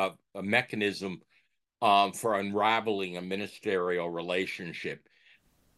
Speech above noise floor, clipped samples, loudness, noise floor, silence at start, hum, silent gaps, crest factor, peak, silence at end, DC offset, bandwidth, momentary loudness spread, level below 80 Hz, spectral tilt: 41 dB; under 0.1%; -30 LUFS; -71 dBFS; 0 s; none; none; 20 dB; -10 dBFS; 0.8 s; under 0.1%; 12.5 kHz; 13 LU; -78 dBFS; -4.5 dB/octave